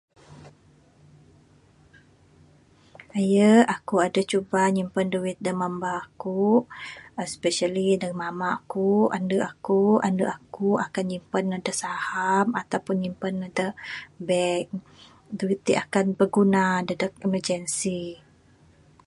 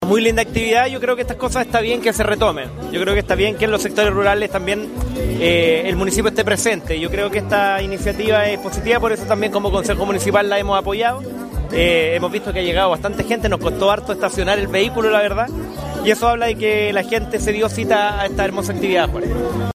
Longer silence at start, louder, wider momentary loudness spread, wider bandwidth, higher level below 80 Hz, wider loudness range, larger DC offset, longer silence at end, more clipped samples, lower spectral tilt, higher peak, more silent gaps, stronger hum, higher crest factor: first, 0.3 s vs 0 s; second, -24 LUFS vs -18 LUFS; first, 11 LU vs 6 LU; second, 11.5 kHz vs 15.5 kHz; second, -64 dBFS vs -30 dBFS; first, 4 LU vs 1 LU; neither; first, 0.9 s vs 0 s; neither; about the same, -5.5 dB/octave vs -4.5 dB/octave; second, -6 dBFS vs -2 dBFS; neither; neither; about the same, 20 dB vs 16 dB